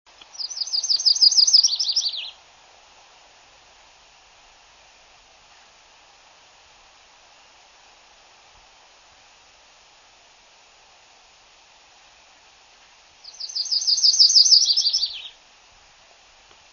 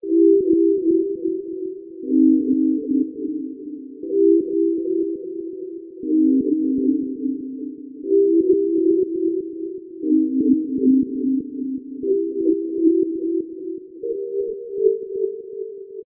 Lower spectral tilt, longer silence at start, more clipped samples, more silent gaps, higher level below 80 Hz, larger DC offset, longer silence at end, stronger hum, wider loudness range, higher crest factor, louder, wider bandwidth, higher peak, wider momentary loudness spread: second, 5 dB/octave vs -16 dB/octave; first, 0.4 s vs 0.05 s; neither; neither; second, -68 dBFS vs -62 dBFS; neither; first, 1.45 s vs 0.05 s; neither; first, 14 LU vs 3 LU; first, 24 dB vs 14 dB; first, -16 LUFS vs -20 LUFS; first, 7.4 kHz vs 0.6 kHz; first, -2 dBFS vs -6 dBFS; first, 20 LU vs 15 LU